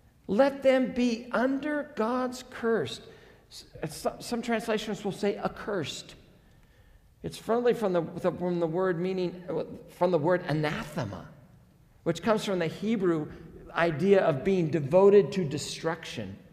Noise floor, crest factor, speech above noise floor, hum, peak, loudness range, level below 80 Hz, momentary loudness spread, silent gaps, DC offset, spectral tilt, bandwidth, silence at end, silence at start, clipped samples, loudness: -58 dBFS; 20 dB; 30 dB; none; -10 dBFS; 8 LU; -60 dBFS; 16 LU; none; under 0.1%; -6 dB/octave; 15 kHz; 0.15 s; 0.3 s; under 0.1%; -28 LUFS